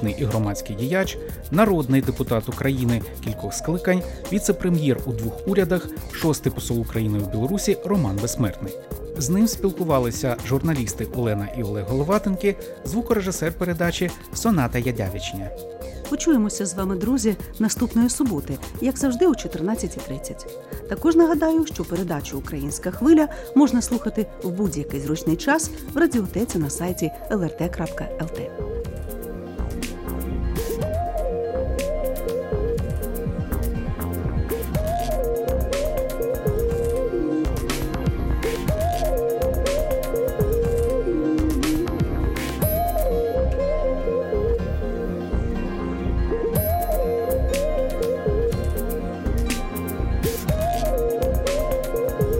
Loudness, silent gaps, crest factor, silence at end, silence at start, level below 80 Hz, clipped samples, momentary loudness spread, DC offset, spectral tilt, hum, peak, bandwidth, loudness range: -24 LUFS; none; 20 dB; 0 s; 0 s; -30 dBFS; under 0.1%; 8 LU; under 0.1%; -6 dB/octave; none; -4 dBFS; 17 kHz; 4 LU